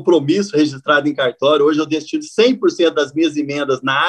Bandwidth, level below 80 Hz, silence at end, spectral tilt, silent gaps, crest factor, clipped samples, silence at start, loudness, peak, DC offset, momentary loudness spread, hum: 9.6 kHz; -66 dBFS; 0 s; -5 dB/octave; none; 14 dB; under 0.1%; 0 s; -16 LUFS; -2 dBFS; under 0.1%; 6 LU; none